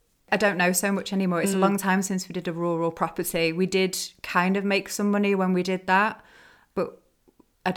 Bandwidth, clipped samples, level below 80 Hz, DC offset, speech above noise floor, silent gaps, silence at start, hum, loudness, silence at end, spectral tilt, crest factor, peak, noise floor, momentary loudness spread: 17 kHz; under 0.1%; -62 dBFS; under 0.1%; 37 dB; none; 0.3 s; none; -25 LUFS; 0 s; -4.5 dB/octave; 18 dB; -6 dBFS; -61 dBFS; 9 LU